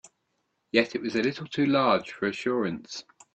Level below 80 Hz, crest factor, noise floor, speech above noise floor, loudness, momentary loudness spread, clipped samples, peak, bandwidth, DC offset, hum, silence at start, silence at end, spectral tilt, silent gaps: -66 dBFS; 22 dB; -76 dBFS; 50 dB; -27 LUFS; 11 LU; under 0.1%; -6 dBFS; 8.6 kHz; under 0.1%; none; 0.05 s; 0.35 s; -5.5 dB/octave; none